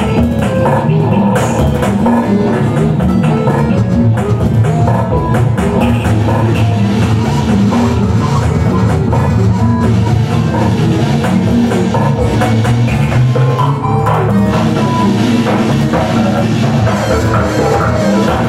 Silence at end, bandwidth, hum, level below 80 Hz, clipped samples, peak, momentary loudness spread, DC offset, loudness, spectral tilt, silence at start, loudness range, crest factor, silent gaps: 0 s; 13 kHz; none; -26 dBFS; under 0.1%; -2 dBFS; 1 LU; under 0.1%; -12 LUFS; -7.5 dB/octave; 0 s; 0 LU; 8 dB; none